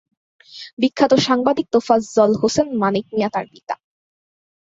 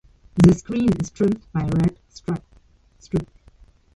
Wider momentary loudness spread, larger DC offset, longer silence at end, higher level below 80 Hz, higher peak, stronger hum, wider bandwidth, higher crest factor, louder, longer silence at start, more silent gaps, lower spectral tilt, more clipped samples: about the same, 15 LU vs 15 LU; neither; first, 0.95 s vs 0.7 s; second, -58 dBFS vs -42 dBFS; about the same, -2 dBFS vs -2 dBFS; neither; second, 8 kHz vs 11 kHz; about the same, 18 dB vs 20 dB; first, -18 LUFS vs -21 LUFS; first, 0.55 s vs 0.35 s; first, 0.73-0.77 s vs none; second, -5 dB/octave vs -8 dB/octave; neither